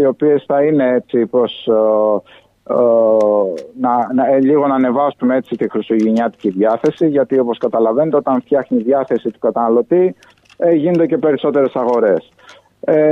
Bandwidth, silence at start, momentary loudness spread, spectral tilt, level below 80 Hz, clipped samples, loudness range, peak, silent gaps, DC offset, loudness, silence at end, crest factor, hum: 7 kHz; 0 s; 6 LU; -8.5 dB/octave; -64 dBFS; under 0.1%; 1 LU; -2 dBFS; none; under 0.1%; -15 LUFS; 0 s; 12 dB; none